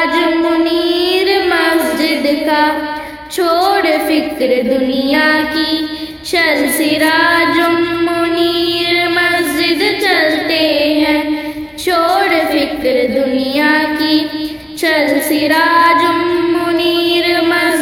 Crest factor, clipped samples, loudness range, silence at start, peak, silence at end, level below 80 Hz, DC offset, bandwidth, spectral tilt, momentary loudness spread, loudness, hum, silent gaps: 12 dB; under 0.1%; 2 LU; 0 s; 0 dBFS; 0 s; -46 dBFS; under 0.1%; 19 kHz; -3 dB/octave; 5 LU; -13 LUFS; none; none